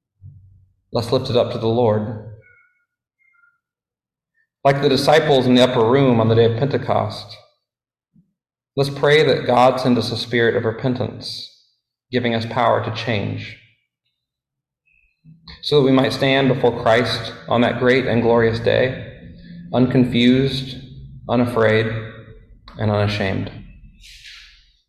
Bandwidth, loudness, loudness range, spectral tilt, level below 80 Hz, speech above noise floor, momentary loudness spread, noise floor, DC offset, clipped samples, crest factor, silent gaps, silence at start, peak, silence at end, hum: 13 kHz; -18 LUFS; 7 LU; -6.5 dB/octave; -48 dBFS; 72 dB; 17 LU; -89 dBFS; under 0.1%; under 0.1%; 16 dB; none; 0.25 s; -2 dBFS; 0.5 s; none